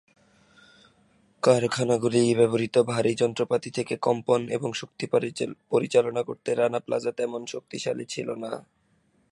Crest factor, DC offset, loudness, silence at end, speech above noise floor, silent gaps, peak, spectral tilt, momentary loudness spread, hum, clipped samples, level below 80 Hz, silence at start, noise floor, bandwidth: 20 dB; under 0.1%; -26 LUFS; 0.7 s; 41 dB; none; -6 dBFS; -5.5 dB/octave; 11 LU; none; under 0.1%; -68 dBFS; 1.45 s; -67 dBFS; 11.5 kHz